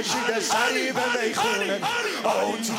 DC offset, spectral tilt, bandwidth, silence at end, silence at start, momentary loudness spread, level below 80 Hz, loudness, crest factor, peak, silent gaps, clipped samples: under 0.1%; -2 dB/octave; 16 kHz; 0 s; 0 s; 3 LU; -72 dBFS; -24 LUFS; 16 dB; -10 dBFS; none; under 0.1%